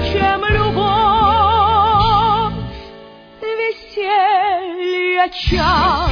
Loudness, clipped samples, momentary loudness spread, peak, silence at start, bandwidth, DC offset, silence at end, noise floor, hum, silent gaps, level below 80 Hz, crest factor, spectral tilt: -15 LUFS; under 0.1%; 10 LU; -2 dBFS; 0 s; 5.4 kHz; under 0.1%; 0 s; -39 dBFS; none; none; -28 dBFS; 12 dB; -6.5 dB/octave